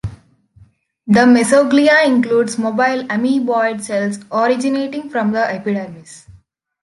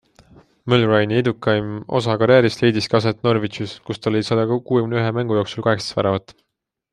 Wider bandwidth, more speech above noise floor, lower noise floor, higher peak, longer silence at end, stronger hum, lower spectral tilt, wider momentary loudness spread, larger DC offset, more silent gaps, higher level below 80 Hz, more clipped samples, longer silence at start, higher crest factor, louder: about the same, 11.5 kHz vs 10.5 kHz; about the same, 35 dB vs 32 dB; about the same, -50 dBFS vs -50 dBFS; about the same, -2 dBFS vs -2 dBFS; about the same, 0.65 s vs 0.6 s; neither; second, -5 dB/octave vs -6.5 dB/octave; about the same, 11 LU vs 9 LU; neither; neither; first, -50 dBFS vs -56 dBFS; neither; second, 0.05 s vs 0.65 s; about the same, 14 dB vs 18 dB; first, -15 LUFS vs -19 LUFS